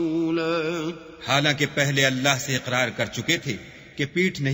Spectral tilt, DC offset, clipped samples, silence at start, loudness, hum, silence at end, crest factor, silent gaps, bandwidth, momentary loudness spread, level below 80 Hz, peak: -4 dB/octave; under 0.1%; under 0.1%; 0 s; -23 LUFS; none; 0 s; 22 dB; none; 16 kHz; 12 LU; -58 dBFS; -2 dBFS